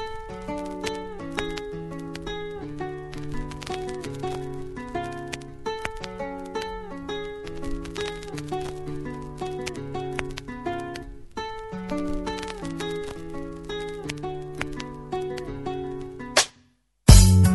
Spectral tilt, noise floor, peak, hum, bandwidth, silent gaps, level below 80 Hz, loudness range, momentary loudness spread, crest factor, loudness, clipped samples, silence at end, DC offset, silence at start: -5 dB/octave; -62 dBFS; 0 dBFS; none; 12 kHz; none; -32 dBFS; 4 LU; 10 LU; 26 dB; -28 LUFS; under 0.1%; 0 s; under 0.1%; 0 s